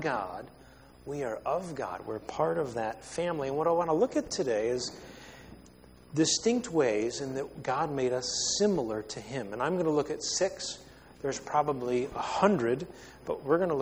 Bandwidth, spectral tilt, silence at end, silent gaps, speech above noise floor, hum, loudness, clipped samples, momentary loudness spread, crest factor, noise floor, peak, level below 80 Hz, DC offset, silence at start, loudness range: over 20 kHz; -4 dB/octave; 0 s; none; 24 dB; none; -31 LUFS; under 0.1%; 12 LU; 22 dB; -54 dBFS; -8 dBFS; -60 dBFS; under 0.1%; 0 s; 3 LU